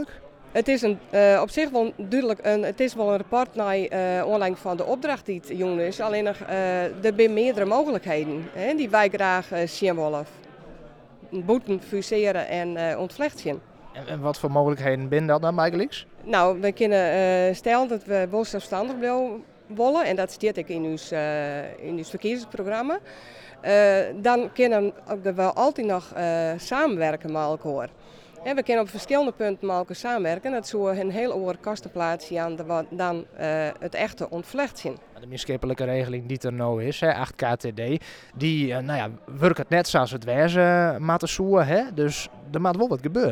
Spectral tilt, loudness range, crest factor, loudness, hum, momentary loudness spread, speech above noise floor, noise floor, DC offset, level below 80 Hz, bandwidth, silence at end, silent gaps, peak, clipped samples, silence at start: -6 dB/octave; 5 LU; 20 dB; -24 LUFS; none; 10 LU; 23 dB; -47 dBFS; under 0.1%; -56 dBFS; 16 kHz; 0 s; none; -6 dBFS; under 0.1%; 0 s